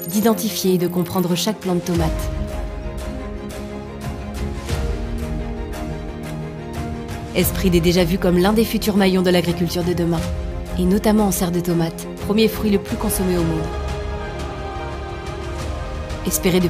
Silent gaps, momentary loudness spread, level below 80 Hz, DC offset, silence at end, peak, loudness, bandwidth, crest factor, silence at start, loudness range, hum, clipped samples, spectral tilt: none; 13 LU; -30 dBFS; under 0.1%; 0 s; -2 dBFS; -21 LUFS; 15.5 kHz; 18 dB; 0 s; 10 LU; none; under 0.1%; -5.5 dB/octave